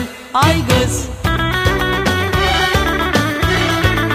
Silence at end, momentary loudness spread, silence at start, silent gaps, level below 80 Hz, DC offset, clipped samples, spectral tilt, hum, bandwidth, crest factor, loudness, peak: 0 s; 4 LU; 0 s; none; -26 dBFS; under 0.1%; under 0.1%; -4.5 dB/octave; none; 15.5 kHz; 14 dB; -15 LUFS; 0 dBFS